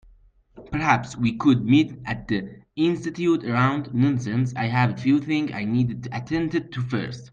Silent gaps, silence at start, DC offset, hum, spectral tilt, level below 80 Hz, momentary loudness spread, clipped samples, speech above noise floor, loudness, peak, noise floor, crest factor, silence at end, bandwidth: none; 0.55 s; under 0.1%; none; -7 dB/octave; -52 dBFS; 8 LU; under 0.1%; 32 dB; -23 LUFS; -4 dBFS; -55 dBFS; 18 dB; 0.05 s; 8.6 kHz